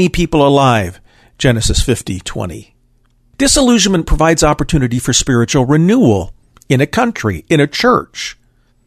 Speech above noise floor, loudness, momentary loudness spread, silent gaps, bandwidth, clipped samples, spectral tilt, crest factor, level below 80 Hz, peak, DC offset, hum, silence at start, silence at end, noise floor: 42 dB; -12 LUFS; 14 LU; none; 13.5 kHz; under 0.1%; -4.5 dB/octave; 14 dB; -26 dBFS; 0 dBFS; under 0.1%; none; 0 s; 0.55 s; -54 dBFS